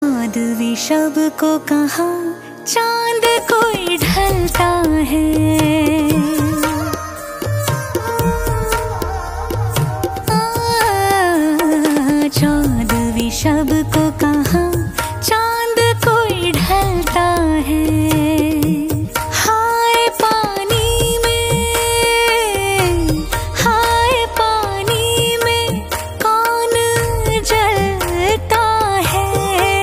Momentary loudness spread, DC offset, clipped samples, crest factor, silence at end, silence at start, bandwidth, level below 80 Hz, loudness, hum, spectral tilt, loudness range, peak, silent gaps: 6 LU; under 0.1%; under 0.1%; 14 dB; 0 s; 0 s; 16 kHz; -28 dBFS; -15 LUFS; none; -4.5 dB/octave; 3 LU; 0 dBFS; none